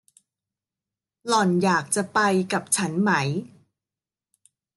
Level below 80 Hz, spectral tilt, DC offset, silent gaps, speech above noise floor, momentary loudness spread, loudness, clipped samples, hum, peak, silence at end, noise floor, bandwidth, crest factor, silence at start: -72 dBFS; -4 dB/octave; under 0.1%; none; over 68 dB; 6 LU; -22 LUFS; under 0.1%; none; -8 dBFS; 1.3 s; under -90 dBFS; 12.5 kHz; 18 dB; 1.25 s